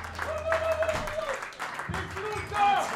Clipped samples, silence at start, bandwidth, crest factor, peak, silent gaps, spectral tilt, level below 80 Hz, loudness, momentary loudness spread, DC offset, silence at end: under 0.1%; 0 s; 16 kHz; 18 dB; -12 dBFS; none; -4 dB/octave; -48 dBFS; -30 LUFS; 9 LU; under 0.1%; 0 s